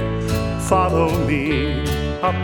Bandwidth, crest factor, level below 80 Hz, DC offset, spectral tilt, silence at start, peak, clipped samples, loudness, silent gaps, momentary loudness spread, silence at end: 19.5 kHz; 16 dB; -30 dBFS; under 0.1%; -6 dB/octave; 0 s; -4 dBFS; under 0.1%; -20 LUFS; none; 5 LU; 0 s